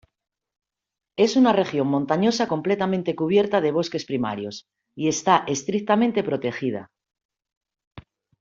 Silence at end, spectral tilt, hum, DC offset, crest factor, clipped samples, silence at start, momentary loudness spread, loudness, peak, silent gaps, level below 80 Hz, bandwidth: 0.4 s; -5 dB/octave; none; under 0.1%; 20 dB; under 0.1%; 1.2 s; 10 LU; -22 LUFS; -4 dBFS; 7.25-7.29 s, 7.57-7.61 s, 7.87-7.91 s; -64 dBFS; 7.8 kHz